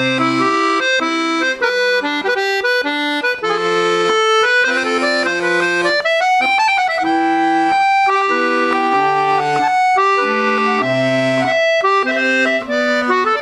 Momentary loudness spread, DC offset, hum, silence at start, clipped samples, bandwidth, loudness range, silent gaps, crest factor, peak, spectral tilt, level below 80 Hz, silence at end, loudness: 3 LU; under 0.1%; none; 0 s; under 0.1%; 12.5 kHz; 1 LU; none; 12 dB; -2 dBFS; -3.5 dB/octave; -58 dBFS; 0 s; -14 LUFS